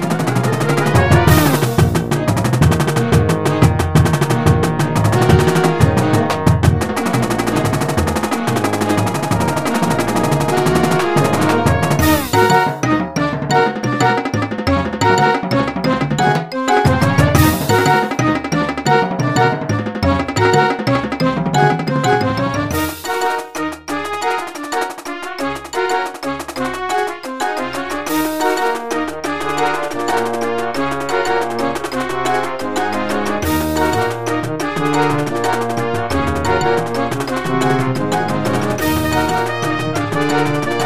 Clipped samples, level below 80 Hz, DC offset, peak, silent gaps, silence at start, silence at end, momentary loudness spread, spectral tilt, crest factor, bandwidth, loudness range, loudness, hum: under 0.1%; -34 dBFS; 1%; 0 dBFS; none; 0 s; 0 s; 7 LU; -5.5 dB/octave; 16 dB; 15.5 kHz; 6 LU; -16 LUFS; none